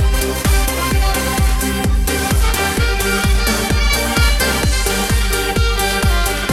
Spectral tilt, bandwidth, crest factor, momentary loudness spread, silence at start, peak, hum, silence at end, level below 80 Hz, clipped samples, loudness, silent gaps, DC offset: -3.5 dB/octave; 16.5 kHz; 12 dB; 2 LU; 0 s; -2 dBFS; none; 0 s; -18 dBFS; under 0.1%; -16 LUFS; none; under 0.1%